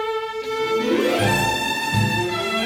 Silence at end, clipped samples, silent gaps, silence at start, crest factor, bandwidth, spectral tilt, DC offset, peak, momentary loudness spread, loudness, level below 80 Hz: 0 s; under 0.1%; none; 0 s; 14 dB; 17.5 kHz; -4.5 dB/octave; under 0.1%; -6 dBFS; 7 LU; -21 LUFS; -46 dBFS